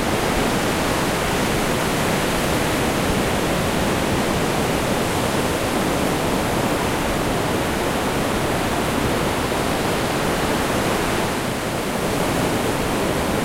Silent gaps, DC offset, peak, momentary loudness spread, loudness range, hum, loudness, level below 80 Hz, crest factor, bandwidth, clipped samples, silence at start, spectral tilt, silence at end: none; under 0.1%; -6 dBFS; 1 LU; 1 LU; none; -20 LUFS; -34 dBFS; 14 dB; 16 kHz; under 0.1%; 0 s; -4.5 dB/octave; 0 s